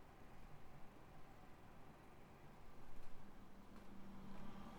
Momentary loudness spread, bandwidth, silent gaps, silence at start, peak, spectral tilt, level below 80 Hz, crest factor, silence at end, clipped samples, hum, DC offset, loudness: 6 LU; 19.5 kHz; none; 0 s; -38 dBFS; -6 dB/octave; -62 dBFS; 14 dB; 0 s; under 0.1%; none; under 0.1%; -63 LUFS